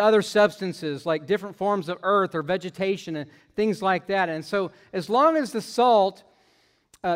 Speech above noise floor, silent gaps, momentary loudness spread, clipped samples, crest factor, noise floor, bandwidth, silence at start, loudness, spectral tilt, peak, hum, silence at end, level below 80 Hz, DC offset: 40 dB; none; 11 LU; under 0.1%; 18 dB; -64 dBFS; 16 kHz; 0 s; -24 LUFS; -5.5 dB/octave; -6 dBFS; none; 0 s; -66 dBFS; under 0.1%